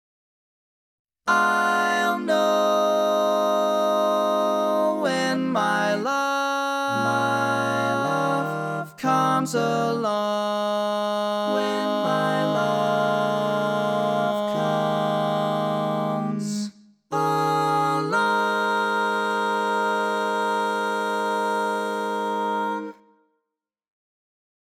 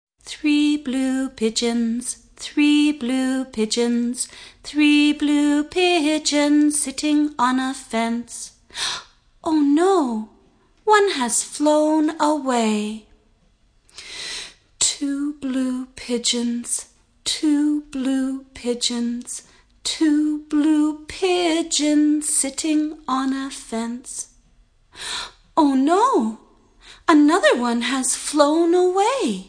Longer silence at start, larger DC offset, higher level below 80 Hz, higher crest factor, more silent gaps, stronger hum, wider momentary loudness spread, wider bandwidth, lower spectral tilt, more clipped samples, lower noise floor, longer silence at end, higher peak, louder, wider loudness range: first, 1.25 s vs 0.25 s; neither; second, -82 dBFS vs -56 dBFS; about the same, 16 dB vs 20 dB; neither; neither; second, 5 LU vs 13 LU; first, 17 kHz vs 10.5 kHz; first, -5 dB/octave vs -2.5 dB/octave; neither; first, -83 dBFS vs -59 dBFS; first, 1.7 s vs 0.05 s; second, -6 dBFS vs 0 dBFS; second, -23 LUFS vs -20 LUFS; about the same, 3 LU vs 5 LU